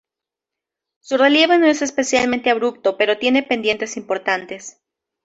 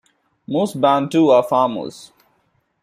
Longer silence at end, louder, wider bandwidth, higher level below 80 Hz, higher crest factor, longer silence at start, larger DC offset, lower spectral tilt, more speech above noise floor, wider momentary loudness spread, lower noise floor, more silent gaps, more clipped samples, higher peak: second, 0.55 s vs 0.8 s; about the same, -17 LUFS vs -17 LUFS; second, 8.2 kHz vs 15 kHz; about the same, -62 dBFS vs -64 dBFS; about the same, 16 dB vs 16 dB; first, 1.1 s vs 0.5 s; neither; second, -2.5 dB/octave vs -6.5 dB/octave; first, 69 dB vs 48 dB; about the same, 11 LU vs 12 LU; first, -86 dBFS vs -65 dBFS; neither; neither; about the same, -2 dBFS vs -2 dBFS